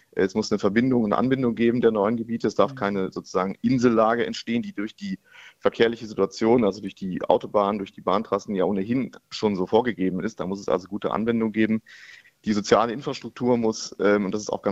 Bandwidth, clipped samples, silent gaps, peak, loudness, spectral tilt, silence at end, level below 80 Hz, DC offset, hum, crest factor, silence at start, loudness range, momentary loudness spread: 8 kHz; under 0.1%; none; -2 dBFS; -24 LUFS; -6 dB/octave; 0 s; -58 dBFS; under 0.1%; none; 20 dB; 0.15 s; 3 LU; 9 LU